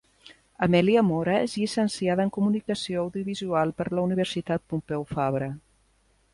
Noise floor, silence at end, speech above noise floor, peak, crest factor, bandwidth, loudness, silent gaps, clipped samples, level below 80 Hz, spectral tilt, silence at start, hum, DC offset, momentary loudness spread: -65 dBFS; 0.75 s; 40 dB; -8 dBFS; 18 dB; 11.5 kHz; -26 LUFS; none; under 0.1%; -58 dBFS; -6.5 dB/octave; 0.25 s; none; under 0.1%; 9 LU